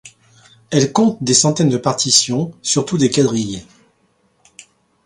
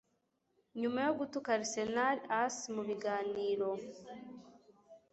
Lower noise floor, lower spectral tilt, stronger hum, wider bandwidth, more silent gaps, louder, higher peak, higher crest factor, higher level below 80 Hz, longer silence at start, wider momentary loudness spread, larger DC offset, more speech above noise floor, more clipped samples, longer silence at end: second, -60 dBFS vs -80 dBFS; about the same, -4 dB/octave vs -3 dB/octave; neither; first, 16 kHz vs 8 kHz; neither; first, -15 LUFS vs -36 LUFS; first, 0 dBFS vs -18 dBFS; about the same, 18 dB vs 20 dB; first, -54 dBFS vs -78 dBFS; second, 0.05 s vs 0.75 s; second, 8 LU vs 17 LU; neither; about the same, 45 dB vs 44 dB; neither; first, 1.4 s vs 0.15 s